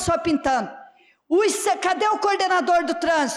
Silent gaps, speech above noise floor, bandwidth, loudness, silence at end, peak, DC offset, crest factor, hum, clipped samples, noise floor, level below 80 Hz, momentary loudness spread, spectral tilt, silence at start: none; 29 dB; 14.5 kHz; -21 LUFS; 0 s; -12 dBFS; under 0.1%; 10 dB; none; under 0.1%; -50 dBFS; -50 dBFS; 4 LU; -3 dB/octave; 0 s